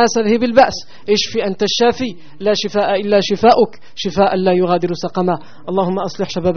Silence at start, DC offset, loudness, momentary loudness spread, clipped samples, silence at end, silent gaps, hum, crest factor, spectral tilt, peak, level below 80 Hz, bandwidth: 0 s; 3%; -16 LUFS; 10 LU; under 0.1%; 0 s; none; none; 16 dB; -3.5 dB/octave; 0 dBFS; -48 dBFS; 6.6 kHz